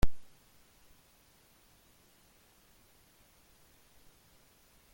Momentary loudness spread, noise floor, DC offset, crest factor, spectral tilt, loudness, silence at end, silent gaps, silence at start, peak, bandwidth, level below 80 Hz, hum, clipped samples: 0 LU; -65 dBFS; under 0.1%; 22 dB; -5.5 dB/octave; -56 LUFS; 4.7 s; none; 0.05 s; -14 dBFS; 17 kHz; -46 dBFS; none; under 0.1%